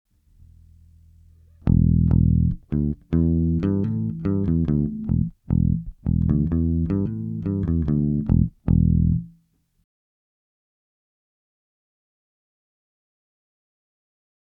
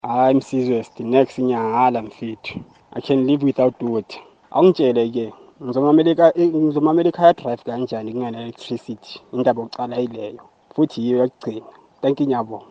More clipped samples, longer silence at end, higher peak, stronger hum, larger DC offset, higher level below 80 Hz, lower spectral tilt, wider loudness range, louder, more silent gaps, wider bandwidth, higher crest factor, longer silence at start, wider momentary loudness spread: neither; first, 5.15 s vs 0.1 s; second, -4 dBFS vs 0 dBFS; neither; neither; first, -32 dBFS vs -64 dBFS; first, -13 dB/octave vs -8 dB/octave; second, 3 LU vs 6 LU; second, -22 LUFS vs -19 LUFS; neither; second, 2.8 kHz vs 8.2 kHz; about the same, 18 dB vs 20 dB; first, 1.65 s vs 0.05 s; second, 7 LU vs 17 LU